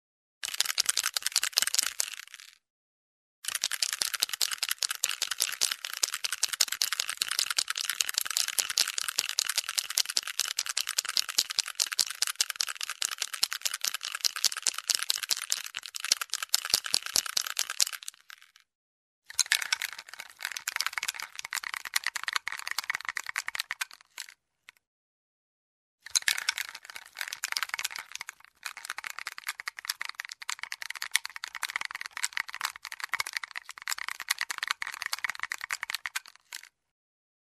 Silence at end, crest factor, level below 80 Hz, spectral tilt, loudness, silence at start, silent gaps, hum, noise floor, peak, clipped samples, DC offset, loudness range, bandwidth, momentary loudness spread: 0.75 s; 32 dB; -80 dBFS; 4 dB/octave; -30 LUFS; 0.45 s; 2.70-3.42 s, 18.75-19.22 s, 24.87-25.98 s; none; -60 dBFS; -2 dBFS; under 0.1%; under 0.1%; 7 LU; 14 kHz; 12 LU